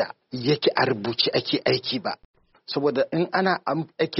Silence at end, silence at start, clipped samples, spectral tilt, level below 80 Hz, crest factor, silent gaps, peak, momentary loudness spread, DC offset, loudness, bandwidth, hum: 0 s; 0 s; under 0.1%; -3 dB/octave; -64 dBFS; 18 dB; 2.25-2.34 s; -6 dBFS; 8 LU; under 0.1%; -24 LUFS; 6 kHz; none